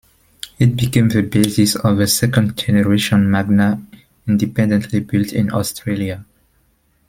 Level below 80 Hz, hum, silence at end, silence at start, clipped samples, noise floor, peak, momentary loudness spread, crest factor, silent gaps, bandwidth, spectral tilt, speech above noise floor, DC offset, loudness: -46 dBFS; none; 0.85 s; 0.45 s; under 0.1%; -59 dBFS; -2 dBFS; 8 LU; 16 dB; none; 16.5 kHz; -5.5 dB/octave; 44 dB; under 0.1%; -16 LUFS